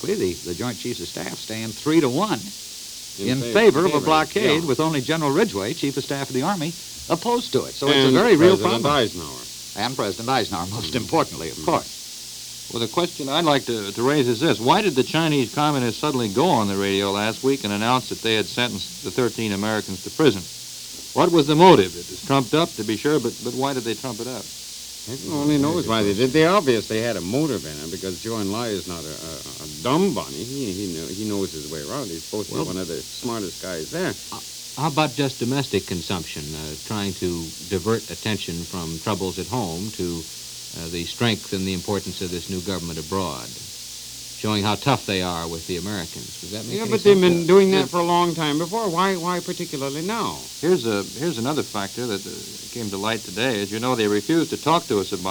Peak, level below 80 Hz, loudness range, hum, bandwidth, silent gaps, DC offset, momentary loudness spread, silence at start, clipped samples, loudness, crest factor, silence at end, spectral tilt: 0 dBFS; -52 dBFS; 7 LU; none; over 20 kHz; none; under 0.1%; 14 LU; 0 s; under 0.1%; -22 LUFS; 22 dB; 0 s; -4.5 dB/octave